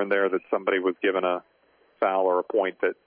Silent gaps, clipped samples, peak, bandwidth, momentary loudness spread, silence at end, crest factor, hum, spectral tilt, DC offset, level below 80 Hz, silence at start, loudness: none; under 0.1%; -10 dBFS; 4.4 kHz; 4 LU; 0.15 s; 16 dB; none; -8.5 dB/octave; under 0.1%; -84 dBFS; 0 s; -25 LUFS